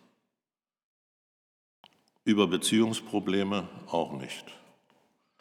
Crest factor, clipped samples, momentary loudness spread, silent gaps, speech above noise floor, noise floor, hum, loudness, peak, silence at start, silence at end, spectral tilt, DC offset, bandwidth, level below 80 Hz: 22 dB; under 0.1%; 15 LU; none; over 62 dB; under -90 dBFS; none; -29 LUFS; -10 dBFS; 2.25 s; 0.85 s; -4.5 dB/octave; under 0.1%; 16 kHz; -74 dBFS